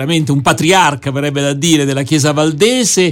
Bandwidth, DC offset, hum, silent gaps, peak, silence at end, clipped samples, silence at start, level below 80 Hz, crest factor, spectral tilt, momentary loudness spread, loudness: 17 kHz; under 0.1%; none; none; 0 dBFS; 0 s; under 0.1%; 0 s; -46 dBFS; 12 dB; -4 dB/octave; 5 LU; -12 LUFS